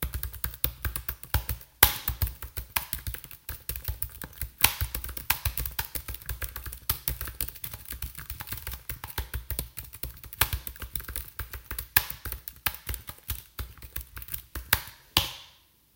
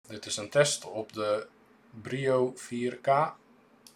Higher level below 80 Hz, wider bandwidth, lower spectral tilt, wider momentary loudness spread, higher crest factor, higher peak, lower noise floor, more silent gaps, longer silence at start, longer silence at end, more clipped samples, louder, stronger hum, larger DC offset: first, -40 dBFS vs -76 dBFS; first, 17.5 kHz vs 15.5 kHz; second, -2 dB/octave vs -4 dB/octave; about the same, 14 LU vs 12 LU; first, 32 dB vs 22 dB; first, 0 dBFS vs -10 dBFS; about the same, -59 dBFS vs -58 dBFS; neither; about the same, 0 s vs 0.1 s; second, 0.45 s vs 0.6 s; neither; about the same, -30 LUFS vs -30 LUFS; neither; neither